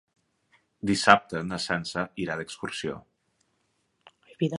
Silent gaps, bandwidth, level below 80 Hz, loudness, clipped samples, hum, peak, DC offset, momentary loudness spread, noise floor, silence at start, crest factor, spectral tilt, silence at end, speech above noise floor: none; 11.5 kHz; -60 dBFS; -27 LUFS; under 0.1%; none; 0 dBFS; under 0.1%; 14 LU; -73 dBFS; 0.85 s; 28 dB; -4.5 dB/octave; 0 s; 47 dB